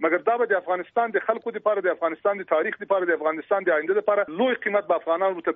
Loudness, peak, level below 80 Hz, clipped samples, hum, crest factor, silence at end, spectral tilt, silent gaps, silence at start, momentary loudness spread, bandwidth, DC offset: -24 LUFS; -8 dBFS; -76 dBFS; under 0.1%; none; 16 dB; 0 s; -2.5 dB/octave; none; 0 s; 3 LU; 3.9 kHz; under 0.1%